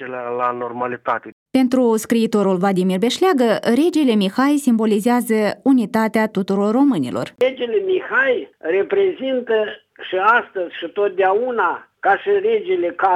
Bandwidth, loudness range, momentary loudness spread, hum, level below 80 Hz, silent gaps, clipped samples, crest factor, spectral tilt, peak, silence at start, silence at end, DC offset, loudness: 15 kHz; 3 LU; 8 LU; none; -68 dBFS; 1.32-1.46 s; under 0.1%; 14 dB; -5.5 dB/octave; -2 dBFS; 0 s; 0 s; under 0.1%; -18 LUFS